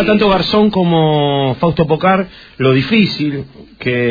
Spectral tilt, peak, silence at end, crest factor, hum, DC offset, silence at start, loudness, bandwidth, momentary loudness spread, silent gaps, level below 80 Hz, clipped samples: -8 dB/octave; 0 dBFS; 0 s; 14 dB; none; under 0.1%; 0 s; -13 LUFS; 5 kHz; 9 LU; none; -40 dBFS; under 0.1%